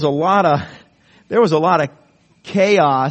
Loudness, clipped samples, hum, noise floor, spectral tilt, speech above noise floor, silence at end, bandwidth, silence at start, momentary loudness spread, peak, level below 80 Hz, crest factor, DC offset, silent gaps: -16 LUFS; under 0.1%; none; -51 dBFS; -6.5 dB/octave; 36 dB; 0 s; 8.4 kHz; 0 s; 10 LU; -2 dBFS; -58 dBFS; 16 dB; under 0.1%; none